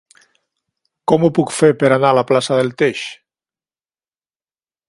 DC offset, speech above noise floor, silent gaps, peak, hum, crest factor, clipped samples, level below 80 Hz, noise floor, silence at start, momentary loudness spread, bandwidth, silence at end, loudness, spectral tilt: under 0.1%; over 76 dB; none; 0 dBFS; none; 18 dB; under 0.1%; -60 dBFS; under -90 dBFS; 1.1 s; 11 LU; 11.5 kHz; 1.75 s; -15 LUFS; -5.5 dB/octave